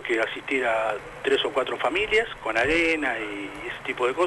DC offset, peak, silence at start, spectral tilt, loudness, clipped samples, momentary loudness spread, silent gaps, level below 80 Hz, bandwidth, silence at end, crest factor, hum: under 0.1%; -12 dBFS; 0 s; -3.5 dB/octave; -25 LUFS; under 0.1%; 10 LU; none; -50 dBFS; 11.5 kHz; 0 s; 14 dB; none